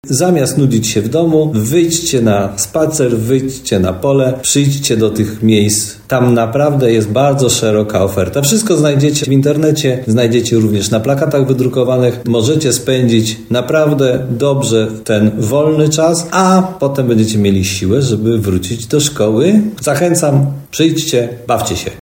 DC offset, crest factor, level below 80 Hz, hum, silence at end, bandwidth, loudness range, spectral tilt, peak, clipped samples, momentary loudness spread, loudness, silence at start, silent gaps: under 0.1%; 12 dB; -44 dBFS; none; 0 s; 16.5 kHz; 1 LU; -5 dB/octave; 0 dBFS; under 0.1%; 4 LU; -12 LUFS; 0.05 s; none